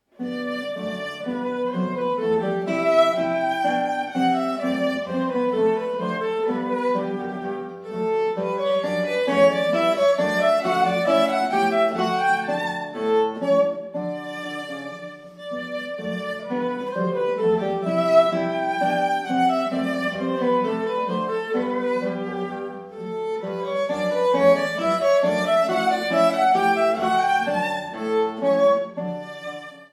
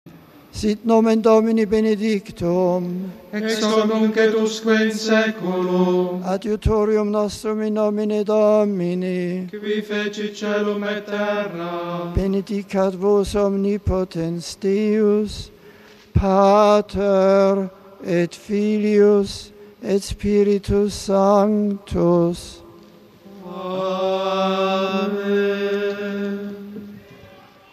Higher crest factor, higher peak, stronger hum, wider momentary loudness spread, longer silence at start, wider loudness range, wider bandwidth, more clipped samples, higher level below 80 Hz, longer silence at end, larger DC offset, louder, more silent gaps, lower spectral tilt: about the same, 18 dB vs 16 dB; about the same, -4 dBFS vs -4 dBFS; neither; about the same, 12 LU vs 12 LU; first, 0.2 s vs 0.05 s; about the same, 6 LU vs 5 LU; about the same, 14 kHz vs 13 kHz; neither; second, -66 dBFS vs -40 dBFS; second, 0.05 s vs 0.45 s; neither; about the same, -22 LUFS vs -20 LUFS; neither; about the same, -5.5 dB/octave vs -6 dB/octave